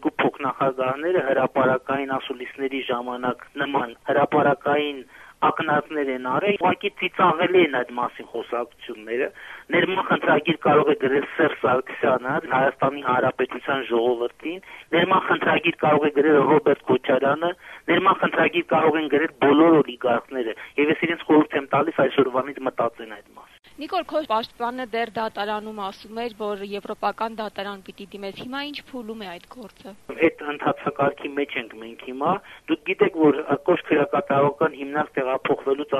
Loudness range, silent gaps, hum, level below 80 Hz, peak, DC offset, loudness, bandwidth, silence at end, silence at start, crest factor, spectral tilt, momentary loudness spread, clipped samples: 8 LU; none; none; -64 dBFS; -4 dBFS; under 0.1%; -22 LUFS; 13 kHz; 0 s; 0 s; 18 dB; -7 dB/octave; 14 LU; under 0.1%